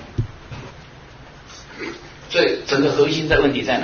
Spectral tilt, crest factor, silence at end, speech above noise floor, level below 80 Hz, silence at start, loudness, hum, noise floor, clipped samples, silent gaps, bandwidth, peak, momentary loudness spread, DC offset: -5 dB/octave; 18 dB; 0 s; 23 dB; -40 dBFS; 0 s; -19 LUFS; none; -41 dBFS; under 0.1%; none; 7 kHz; -2 dBFS; 22 LU; under 0.1%